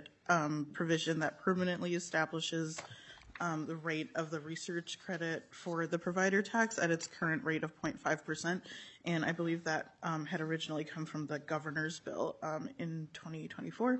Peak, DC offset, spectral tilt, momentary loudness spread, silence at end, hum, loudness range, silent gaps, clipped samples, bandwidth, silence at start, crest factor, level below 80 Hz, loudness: -16 dBFS; under 0.1%; -5 dB/octave; 10 LU; 0 s; none; 5 LU; none; under 0.1%; 8.2 kHz; 0 s; 22 dB; -76 dBFS; -37 LUFS